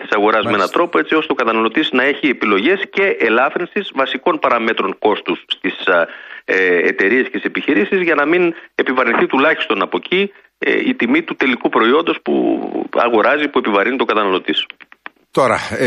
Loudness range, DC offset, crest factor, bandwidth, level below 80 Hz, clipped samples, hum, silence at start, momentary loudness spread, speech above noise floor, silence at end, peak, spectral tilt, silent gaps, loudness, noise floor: 2 LU; under 0.1%; 14 dB; 11 kHz; -60 dBFS; under 0.1%; none; 0 s; 6 LU; 24 dB; 0 s; 0 dBFS; -5 dB/octave; none; -15 LUFS; -40 dBFS